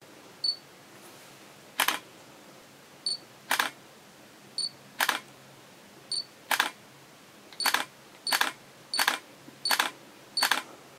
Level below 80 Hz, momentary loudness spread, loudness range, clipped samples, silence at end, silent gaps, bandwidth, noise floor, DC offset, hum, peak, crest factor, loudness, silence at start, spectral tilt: -82 dBFS; 24 LU; 4 LU; under 0.1%; 0 s; none; 16 kHz; -53 dBFS; under 0.1%; none; -4 dBFS; 30 dB; -30 LUFS; 0 s; 0.5 dB/octave